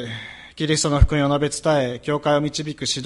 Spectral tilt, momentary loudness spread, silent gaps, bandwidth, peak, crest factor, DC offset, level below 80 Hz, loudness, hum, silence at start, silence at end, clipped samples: -4.5 dB/octave; 11 LU; none; 11.5 kHz; 0 dBFS; 20 dB; under 0.1%; -28 dBFS; -21 LUFS; none; 0 s; 0 s; under 0.1%